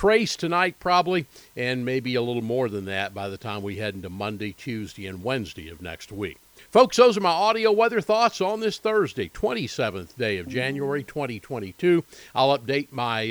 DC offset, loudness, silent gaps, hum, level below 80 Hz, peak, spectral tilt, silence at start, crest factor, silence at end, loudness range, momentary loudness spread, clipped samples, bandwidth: under 0.1%; -24 LUFS; none; none; -56 dBFS; -4 dBFS; -5 dB/octave; 0 s; 22 dB; 0 s; 10 LU; 13 LU; under 0.1%; over 20 kHz